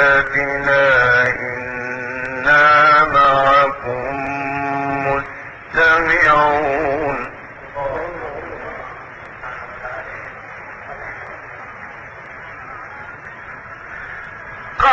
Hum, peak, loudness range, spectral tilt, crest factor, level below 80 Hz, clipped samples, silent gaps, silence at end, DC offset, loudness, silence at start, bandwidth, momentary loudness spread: none; -2 dBFS; 19 LU; -5 dB/octave; 16 dB; -42 dBFS; under 0.1%; none; 0 s; under 0.1%; -15 LUFS; 0 s; 8 kHz; 21 LU